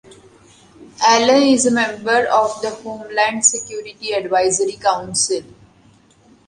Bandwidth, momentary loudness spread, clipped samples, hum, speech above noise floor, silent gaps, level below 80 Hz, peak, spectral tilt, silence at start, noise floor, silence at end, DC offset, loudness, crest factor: 11.5 kHz; 13 LU; under 0.1%; none; 34 dB; none; -58 dBFS; -2 dBFS; -2 dB/octave; 0.1 s; -51 dBFS; 1.05 s; under 0.1%; -16 LUFS; 18 dB